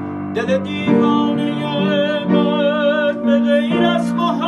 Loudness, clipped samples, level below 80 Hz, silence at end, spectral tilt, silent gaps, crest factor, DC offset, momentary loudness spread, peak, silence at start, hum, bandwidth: -16 LUFS; under 0.1%; -56 dBFS; 0 s; -7 dB/octave; none; 14 dB; under 0.1%; 5 LU; -2 dBFS; 0 s; none; 10.5 kHz